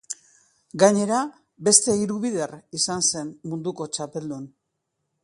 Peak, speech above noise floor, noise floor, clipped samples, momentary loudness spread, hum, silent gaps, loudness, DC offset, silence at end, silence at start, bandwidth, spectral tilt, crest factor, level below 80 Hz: 0 dBFS; 55 dB; -78 dBFS; under 0.1%; 19 LU; none; none; -22 LUFS; under 0.1%; 0.75 s; 0.1 s; 11.5 kHz; -3 dB/octave; 24 dB; -66 dBFS